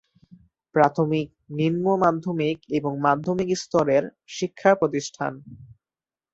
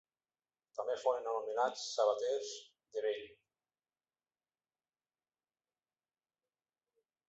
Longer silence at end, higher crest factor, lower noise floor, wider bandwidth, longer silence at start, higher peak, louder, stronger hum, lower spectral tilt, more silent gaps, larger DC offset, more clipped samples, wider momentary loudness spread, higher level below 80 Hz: second, 0.65 s vs 3.95 s; about the same, 20 dB vs 22 dB; about the same, under -90 dBFS vs under -90 dBFS; about the same, 8 kHz vs 8 kHz; about the same, 0.75 s vs 0.75 s; first, -4 dBFS vs -20 dBFS; first, -23 LUFS vs -37 LUFS; neither; first, -6 dB/octave vs 1 dB/octave; neither; neither; neither; about the same, 11 LU vs 13 LU; first, -62 dBFS vs -88 dBFS